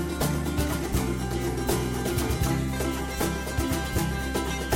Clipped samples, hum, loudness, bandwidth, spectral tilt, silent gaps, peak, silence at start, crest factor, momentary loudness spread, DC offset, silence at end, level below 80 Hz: under 0.1%; none; -28 LUFS; 17 kHz; -5 dB/octave; none; -10 dBFS; 0 s; 16 dB; 2 LU; under 0.1%; 0 s; -34 dBFS